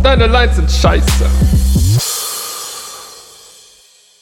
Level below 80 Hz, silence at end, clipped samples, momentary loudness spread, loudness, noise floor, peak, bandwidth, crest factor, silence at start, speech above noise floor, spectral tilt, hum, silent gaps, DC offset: -16 dBFS; 1 s; under 0.1%; 17 LU; -13 LUFS; -46 dBFS; 0 dBFS; 17 kHz; 12 dB; 0 s; 37 dB; -4.5 dB/octave; none; none; under 0.1%